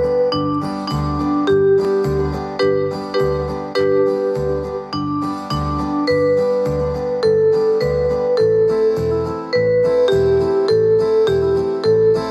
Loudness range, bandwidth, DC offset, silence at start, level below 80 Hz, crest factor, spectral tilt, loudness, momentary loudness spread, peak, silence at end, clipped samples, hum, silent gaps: 4 LU; 11.5 kHz; under 0.1%; 0 s; -36 dBFS; 10 dB; -7.5 dB/octave; -17 LUFS; 7 LU; -6 dBFS; 0 s; under 0.1%; none; none